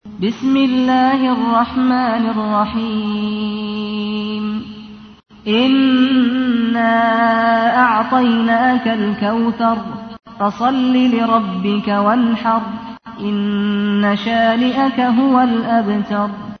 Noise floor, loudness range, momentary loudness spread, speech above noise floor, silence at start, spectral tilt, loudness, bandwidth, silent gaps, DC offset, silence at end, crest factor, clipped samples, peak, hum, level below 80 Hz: -35 dBFS; 5 LU; 9 LU; 21 dB; 0.05 s; -7 dB/octave; -15 LUFS; 6.4 kHz; none; under 0.1%; 0.05 s; 12 dB; under 0.1%; -2 dBFS; none; -52 dBFS